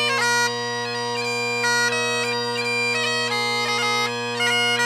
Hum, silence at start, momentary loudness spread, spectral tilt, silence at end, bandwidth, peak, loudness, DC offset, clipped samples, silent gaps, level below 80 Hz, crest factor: none; 0 s; 5 LU; -1.5 dB/octave; 0 s; 15.5 kHz; -10 dBFS; -21 LUFS; under 0.1%; under 0.1%; none; -76 dBFS; 14 dB